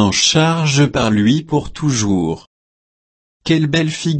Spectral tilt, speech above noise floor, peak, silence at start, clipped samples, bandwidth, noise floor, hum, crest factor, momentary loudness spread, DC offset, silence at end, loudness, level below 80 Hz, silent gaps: -4.5 dB/octave; over 75 dB; -2 dBFS; 0 s; under 0.1%; 8.8 kHz; under -90 dBFS; none; 14 dB; 9 LU; under 0.1%; 0 s; -15 LUFS; -42 dBFS; 2.47-3.40 s